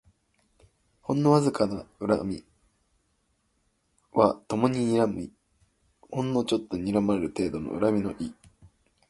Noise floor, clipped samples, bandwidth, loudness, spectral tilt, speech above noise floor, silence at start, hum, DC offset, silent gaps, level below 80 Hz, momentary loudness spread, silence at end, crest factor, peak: -72 dBFS; under 0.1%; 11.5 kHz; -27 LUFS; -7 dB/octave; 46 dB; 1.1 s; none; under 0.1%; none; -56 dBFS; 14 LU; 0.8 s; 24 dB; -4 dBFS